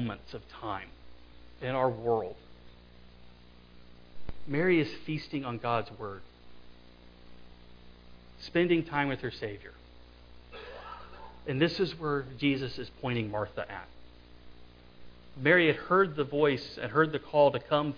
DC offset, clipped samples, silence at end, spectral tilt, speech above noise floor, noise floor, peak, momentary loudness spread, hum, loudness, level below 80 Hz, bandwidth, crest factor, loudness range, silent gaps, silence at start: under 0.1%; under 0.1%; 0 s; -7.5 dB/octave; 24 dB; -54 dBFS; -10 dBFS; 21 LU; 60 Hz at -55 dBFS; -30 LUFS; -56 dBFS; 5.2 kHz; 22 dB; 8 LU; none; 0 s